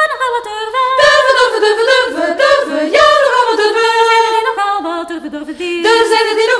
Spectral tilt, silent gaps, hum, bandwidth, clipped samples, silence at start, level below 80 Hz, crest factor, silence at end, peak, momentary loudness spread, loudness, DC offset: -1.5 dB/octave; none; none; 11 kHz; under 0.1%; 0 s; -50 dBFS; 12 dB; 0 s; 0 dBFS; 11 LU; -11 LUFS; under 0.1%